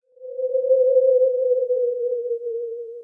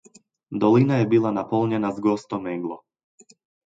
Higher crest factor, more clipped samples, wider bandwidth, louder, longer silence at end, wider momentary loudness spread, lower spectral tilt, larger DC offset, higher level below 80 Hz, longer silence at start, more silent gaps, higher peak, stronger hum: second, 12 dB vs 18 dB; neither; second, 0.7 kHz vs 7.8 kHz; about the same, -21 LUFS vs -22 LUFS; second, 0 s vs 1.05 s; about the same, 13 LU vs 14 LU; about the same, -7.5 dB/octave vs -8.5 dB/octave; neither; second, -80 dBFS vs -64 dBFS; second, 0.2 s vs 0.5 s; neither; about the same, -8 dBFS vs -6 dBFS; neither